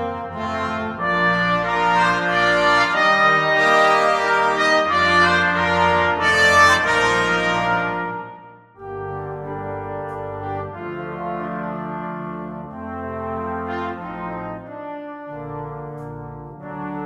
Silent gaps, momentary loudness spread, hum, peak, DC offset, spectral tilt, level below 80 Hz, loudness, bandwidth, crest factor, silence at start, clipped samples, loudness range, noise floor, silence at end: none; 18 LU; none; -2 dBFS; under 0.1%; -4 dB/octave; -48 dBFS; -18 LUFS; 16 kHz; 18 dB; 0 s; under 0.1%; 14 LU; -42 dBFS; 0 s